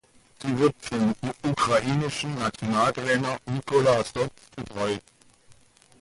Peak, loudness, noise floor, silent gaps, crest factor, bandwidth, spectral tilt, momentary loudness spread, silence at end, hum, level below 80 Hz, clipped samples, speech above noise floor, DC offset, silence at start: -10 dBFS; -26 LUFS; -56 dBFS; none; 16 dB; 11.5 kHz; -5.5 dB/octave; 9 LU; 0.5 s; none; -56 dBFS; under 0.1%; 30 dB; under 0.1%; 0.4 s